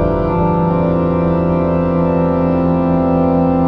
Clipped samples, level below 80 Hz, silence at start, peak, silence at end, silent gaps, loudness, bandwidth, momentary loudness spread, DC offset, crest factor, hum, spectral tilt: under 0.1%; -30 dBFS; 0 s; -2 dBFS; 0 s; none; -14 LUFS; 4.8 kHz; 1 LU; under 0.1%; 10 dB; none; -11.5 dB/octave